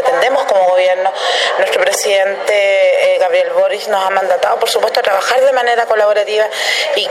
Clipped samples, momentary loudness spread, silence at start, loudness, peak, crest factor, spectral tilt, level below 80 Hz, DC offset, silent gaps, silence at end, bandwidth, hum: under 0.1%; 3 LU; 0 s; -12 LUFS; 0 dBFS; 12 dB; 0 dB/octave; -68 dBFS; under 0.1%; none; 0 s; 15.5 kHz; none